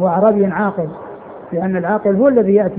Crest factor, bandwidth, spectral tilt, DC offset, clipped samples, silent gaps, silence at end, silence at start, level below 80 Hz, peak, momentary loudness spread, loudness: 14 dB; 3.7 kHz; -13 dB/octave; under 0.1%; under 0.1%; none; 0 s; 0 s; -52 dBFS; 0 dBFS; 18 LU; -15 LUFS